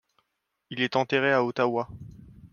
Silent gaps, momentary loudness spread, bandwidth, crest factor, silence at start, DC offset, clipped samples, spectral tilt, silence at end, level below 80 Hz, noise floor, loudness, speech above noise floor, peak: none; 16 LU; 7 kHz; 20 dB; 0.7 s; under 0.1%; under 0.1%; -6 dB/octave; 0.05 s; -60 dBFS; -79 dBFS; -25 LUFS; 53 dB; -8 dBFS